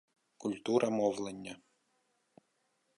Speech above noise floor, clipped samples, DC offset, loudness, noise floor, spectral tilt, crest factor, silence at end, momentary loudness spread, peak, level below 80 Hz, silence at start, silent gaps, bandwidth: 45 dB; under 0.1%; under 0.1%; -34 LUFS; -78 dBFS; -5.5 dB/octave; 22 dB; 1.4 s; 17 LU; -16 dBFS; -78 dBFS; 0.4 s; none; 11.5 kHz